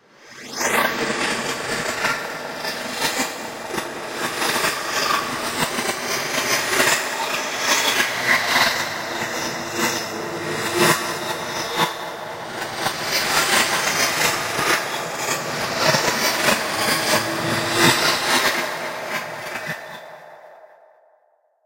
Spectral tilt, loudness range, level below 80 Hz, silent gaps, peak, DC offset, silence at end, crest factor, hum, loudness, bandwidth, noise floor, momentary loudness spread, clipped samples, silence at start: -1.5 dB/octave; 5 LU; -56 dBFS; none; -2 dBFS; under 0.1%; 1 s; 20 dB; none; -20 LUFS; 16 kHz; -62 dBFS; 11 LU; under 0.1%; 0.2 s